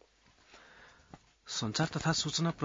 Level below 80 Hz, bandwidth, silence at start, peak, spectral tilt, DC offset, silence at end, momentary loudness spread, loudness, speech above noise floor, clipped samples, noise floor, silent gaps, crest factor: -62 dBFS; 7.8 kHz; 0.55 s; -16 dBFS; -4 dB/octave; under 0.1%; 0 s; 21 LU; -33 LUFS; 33 dB; under 0.1%; -65 dBFS; none; 22 dB